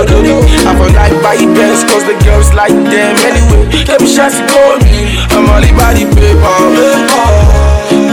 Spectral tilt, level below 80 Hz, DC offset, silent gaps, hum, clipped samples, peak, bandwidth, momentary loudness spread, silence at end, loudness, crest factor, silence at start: -5 dB/octave; -10 dBFS; under 0.1%; none; none; 10%; 0 dBFS; 17 kHz; 2 LU; 0 s; -7 LUFS; 6 dB; 0 s